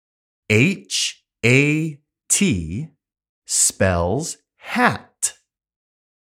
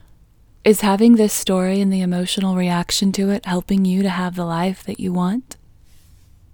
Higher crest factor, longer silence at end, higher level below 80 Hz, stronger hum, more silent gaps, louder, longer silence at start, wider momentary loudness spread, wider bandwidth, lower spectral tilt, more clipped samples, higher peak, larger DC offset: about the same, 22 dB vs 18 dB; second, 1 s vs 1.15 s; about the same, -46 dBFS vs -48 dBFS; neither; first, 3.29-3.42 s vs none; about the same, -19 LUFS vs -18 LUFS; second, 0.5 s vs 0.65 s; first, 14 LU vs 9 LU; second, 16.5 kHz vs 19.5 kHz; second, -3.5 dB/octave vs -5.5 dB/octave; neither; about the same, 0 dBFS vs 0 dBFS; neither